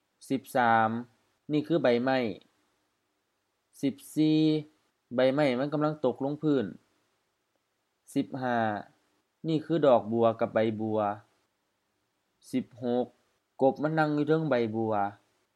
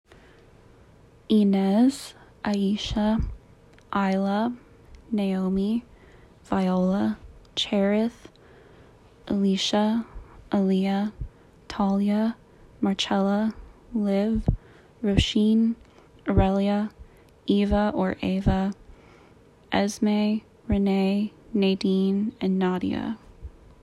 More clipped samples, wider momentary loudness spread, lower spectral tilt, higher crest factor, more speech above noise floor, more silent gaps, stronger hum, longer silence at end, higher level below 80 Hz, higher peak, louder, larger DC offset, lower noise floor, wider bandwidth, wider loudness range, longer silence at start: neither; about the same, 11 LU vs 12 LU; about the same, -7 dB/octave vs -6.5 dB/octave; about the same, 20 dB vs 20 dB; first, 51 dB vs 31 dB; neither; neither; about the same, 0.4 s vs 0.3 s; second, -80 dBFS vs -40 dBFS; second, -10 dBFS vs -6 dBFS; second, -29 LUFS vs -25 LUFS; neither; first, -78 dBFS vs -54 dBFS; first, 13.5 kHz vs 11.5 kHz; about the same, 5 LU vs 3 LU; second, 0.2 s vs 1.3 s